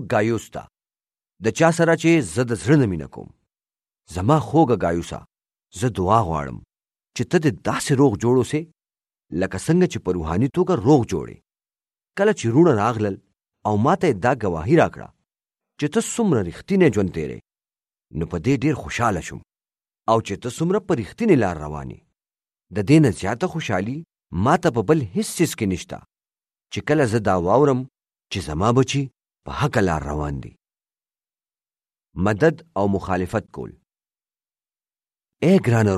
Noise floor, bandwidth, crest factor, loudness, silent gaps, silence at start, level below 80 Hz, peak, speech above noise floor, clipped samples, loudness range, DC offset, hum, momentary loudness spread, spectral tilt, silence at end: under -90 dBFS; 14 kHz; 20 dB; -21 LUFS; none; 0 s; -46 dBFS; -2 dBFS; over 70 dB; under 0.1%; 5 LU; under 0.1%; none; 17 LU; -6.5 dB/octave; 0 s